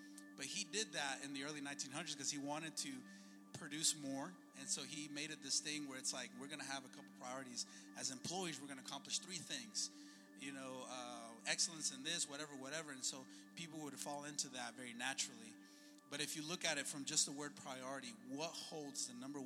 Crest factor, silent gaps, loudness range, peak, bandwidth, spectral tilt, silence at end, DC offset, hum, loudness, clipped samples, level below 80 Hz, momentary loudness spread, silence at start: 24 dB; none; 4 LU; -24 dBFS; 16.5 kHz; -1.5 dB/octave; 0 s; under 0.1%; none; -45 LUFS; under 0.1%; under -90 dBFS; 14 LU; 0 s